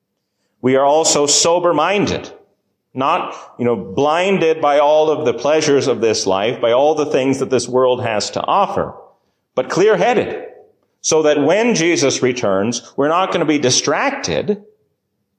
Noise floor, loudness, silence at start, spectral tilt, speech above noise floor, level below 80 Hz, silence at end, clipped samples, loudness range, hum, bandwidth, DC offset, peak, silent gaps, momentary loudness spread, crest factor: -70 dBFS; -15 LUFS; 0.65 s; -3.5 dB/octave; 55 dB; -52 dBFS; 0.8 s; under 0.1%; 3 LU; none; 13 kHz; under 0.1%; -2 dBFS; none; 9 LU; 14 dB